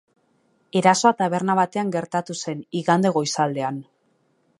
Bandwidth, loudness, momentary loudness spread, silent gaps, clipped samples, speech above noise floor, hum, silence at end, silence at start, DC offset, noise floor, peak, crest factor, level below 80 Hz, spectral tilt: 11.5 kHz; -22 LUFS; 11 LU; none; under 0.1%; 45 dB; none; 0.8 s; 0.75 s; under 0.1%; -66 dBFS; -2 dBFS; 22 dB; -72 dBFS; -5 dB/octave